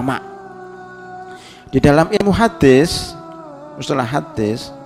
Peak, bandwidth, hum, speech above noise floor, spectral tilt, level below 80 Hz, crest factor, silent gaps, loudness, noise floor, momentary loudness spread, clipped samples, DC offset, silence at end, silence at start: 0 dBFS; 15 kHz; none; 22 dB; -6 dB/octave; -38 dBFS; 16 dB; none; -15 LUFS; -36 dBFS; 23 LU; under 0.1%; under 0.1%; 0 s; 0 s